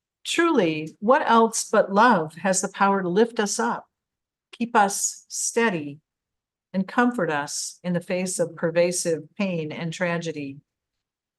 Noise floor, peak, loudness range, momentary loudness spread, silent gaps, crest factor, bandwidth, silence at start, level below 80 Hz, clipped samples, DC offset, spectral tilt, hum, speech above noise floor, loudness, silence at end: -87 dBFS; -6 dBFS; 5 LU; 11 LU; none; 18 dB; 12.5 kHz; 0.25 s; -74 dBFS; under 0.1%; under 0.1%; -4 dB/octave; none; 64 dB; -23 LUFS; 0.8 s